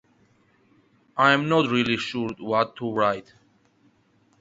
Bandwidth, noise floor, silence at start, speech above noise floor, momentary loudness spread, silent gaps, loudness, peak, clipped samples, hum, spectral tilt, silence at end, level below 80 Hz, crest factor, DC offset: 8 kHz; -63 dBFS; 1.15 s; 40 dB; 10 LU; none; -23 LUFS; -2 dBFS; under 0.1%; none; -5.5 dB/octave; 1.2 s; -64 dBFS; 24 dB; under 0.1%